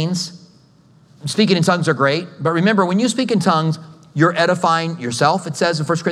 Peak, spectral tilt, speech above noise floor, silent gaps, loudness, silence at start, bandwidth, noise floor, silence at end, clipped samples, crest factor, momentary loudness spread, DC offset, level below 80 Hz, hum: 0 dBFS; -5 dB/octave; 34 dB; none; -17 LUFS; 0 s; 13 kHz; -50 dBFS; 0 s; under 0.1%; 18 dB; 9 LU; under 0.1%; -68 dBFS; none